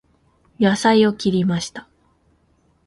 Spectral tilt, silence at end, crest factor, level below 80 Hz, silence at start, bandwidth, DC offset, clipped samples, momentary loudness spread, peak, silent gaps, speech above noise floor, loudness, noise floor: -5.5 dB/octave; 1.05 s; 18 dB; -56 dBFS; 0.6 s; 11.5 kHz; under 0.1%; under 0.1%; 14 LU; -2 dBFS; none; 43 dB; -18 LUFS; -61 dBFS